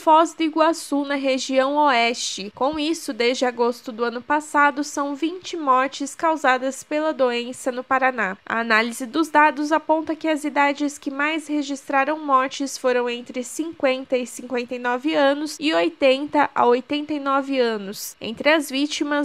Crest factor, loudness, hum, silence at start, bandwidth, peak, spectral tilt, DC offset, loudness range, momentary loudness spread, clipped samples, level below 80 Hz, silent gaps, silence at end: 18 dB; -21 LUFS; none; 0 s; 15.5 kHz; -2 dBFS; -2.5 dB/octave; under 0.1%; 2 LU; 9 LU; under 0.1%; -66 dBFS; none; 0 s